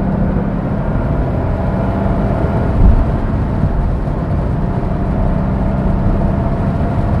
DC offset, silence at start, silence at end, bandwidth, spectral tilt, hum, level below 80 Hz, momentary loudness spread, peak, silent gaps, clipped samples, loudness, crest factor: under 0.1%; 0 s; 0 s; 5.4 kHz; -10.5 dB/octave; none; -18 dBFS; 4 LU; 0 dBFS; none; under 0.1%; -16 LUFS; 14 dB